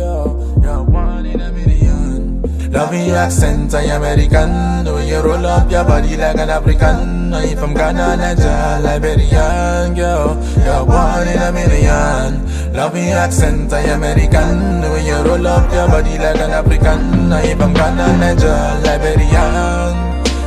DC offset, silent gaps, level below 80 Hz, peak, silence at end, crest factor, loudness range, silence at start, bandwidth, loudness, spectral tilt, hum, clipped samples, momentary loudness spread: 0.2%; none; -16 dBFS; 0 dBFS; 0 s; 12 dB; 2 LU; 0 s; 13 kHz; -14 LUFS; -6.5 dB/octave; none; under 0.1%; 5 LU